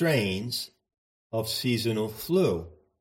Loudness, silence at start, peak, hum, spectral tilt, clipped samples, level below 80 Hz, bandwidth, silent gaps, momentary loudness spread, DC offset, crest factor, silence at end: -28 LUFS; 0 s; -12 dBFS; none; -5 dB/octave; under 0.1%; -58 dBFS; 16.5 kHz; 0.98-1.30 s; 10 LU; under 0.1%; 16 dB; 0.25 s